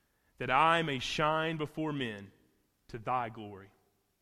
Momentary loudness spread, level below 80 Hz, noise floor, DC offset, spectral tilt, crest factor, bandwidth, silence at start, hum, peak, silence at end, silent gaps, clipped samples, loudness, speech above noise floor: 21 LU; -62 dBFS; -72 dBFS; under 0.1%; -5 dB/octave; 22 dB; 15 kHz; 0.4 s; none; -12 dBFS; 0.55 s; none; under 0.1%; -32 LUFS; 39 dB